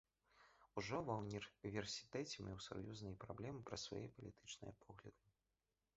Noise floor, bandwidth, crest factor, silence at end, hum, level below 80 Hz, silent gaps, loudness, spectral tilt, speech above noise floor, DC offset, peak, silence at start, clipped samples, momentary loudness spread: under -90 dBFS; 7.6 kHz; 22 dB; 0.85 s; none; -72 dBFS; none; -50 LUFS; -4.5 dB/octave; over 39 dB; under 0.1%; -30 dBFS; 0.35 s; under 0.1%; 13 LU